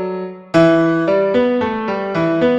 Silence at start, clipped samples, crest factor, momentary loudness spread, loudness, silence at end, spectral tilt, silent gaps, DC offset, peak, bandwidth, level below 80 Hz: 0 s; under 0.1%; 14 dB; 8 LU; -16 LUFS; 0 s; -7.5 dB/octave; none; under 0.1%; -2 dBFS; 7.8 kHz; -50 dBFS